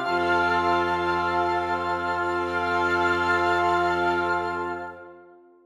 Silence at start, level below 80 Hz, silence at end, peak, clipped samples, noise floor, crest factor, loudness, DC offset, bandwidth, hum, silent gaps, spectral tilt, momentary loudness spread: 0 s; -54 dBFS; 0.4 s; -10 dBFS; under 0.1%; -51 dBFS; 14 dB; -24 LUFS; under 0.1%; 12 kHz; none; none; -5.5 dB/octave; 7 LU